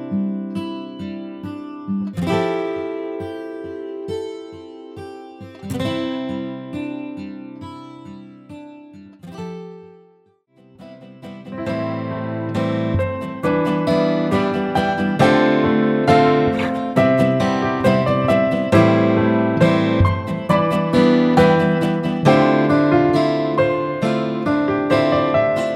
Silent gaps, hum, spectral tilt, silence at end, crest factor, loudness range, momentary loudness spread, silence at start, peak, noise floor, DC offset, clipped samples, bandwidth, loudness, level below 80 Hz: none; none; -7.5 dB/octave; 0 s; 18 dB; 17 LU; 20 LU; 0 s; -2 dBFS; -56 dBFS; under 0.1%; under 0.1%; 14.5 kHz; -18 LUFS; -46 dBFS